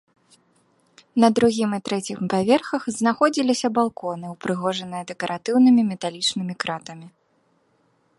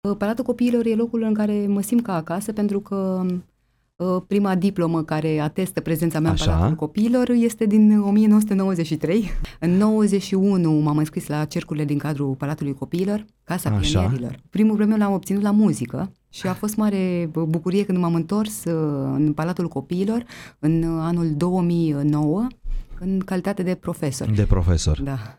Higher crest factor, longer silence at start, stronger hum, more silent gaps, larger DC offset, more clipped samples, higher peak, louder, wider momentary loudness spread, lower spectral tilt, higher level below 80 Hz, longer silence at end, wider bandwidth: about the same, 20 dB vs 18 dB; first, 1.15 s vs 0.05 s; neither; neither; neither; neither; about the same, -4 dBFS vs -2 dBFS; about the same, -22 LUFS vs -21 LUFS; first, 13 LU vs 8 LU; second, -5 dB/octave vs -7 dB/octave; second, -64 dBFS vs -36 dBFS; first, 1.1 s vs 0.05 s; second, 11.5 kHz vs 15.5 kHz